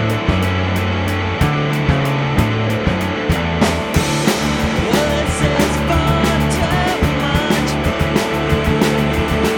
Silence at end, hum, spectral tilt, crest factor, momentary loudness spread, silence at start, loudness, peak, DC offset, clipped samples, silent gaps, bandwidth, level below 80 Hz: 0 s; none; -5.5 dB/octave; 16 dB; 3 LU; 0 s; -16 LUFS; 0 dBFS; under 0.1%; under 0.1%; none; over 20 kHz; -26 dBFS